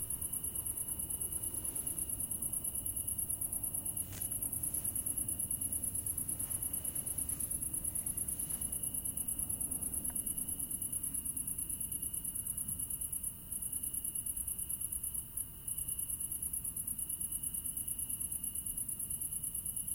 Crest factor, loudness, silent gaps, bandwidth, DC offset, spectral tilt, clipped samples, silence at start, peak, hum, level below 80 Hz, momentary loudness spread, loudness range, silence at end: 18 dB; -36 LUFS; none; 17 kHz; under 0.1%; -2.5 dB/octave; under 0.1%; 0 s; -20 dBFS; none; -56 dBFS; 2 LU; 2 LU; 0 s